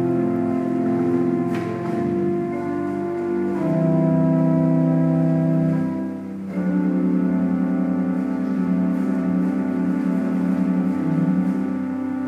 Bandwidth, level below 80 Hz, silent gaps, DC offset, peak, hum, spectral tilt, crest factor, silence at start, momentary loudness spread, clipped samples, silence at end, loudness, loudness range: 7.6 kHz; -58 dBFS; none; under 0.1%; -8 dBFS; none; -10 dB/octave; 12 dB; 0 s; 7 LU; under 0.1%; 0 s; -21 LUFS; 3 LU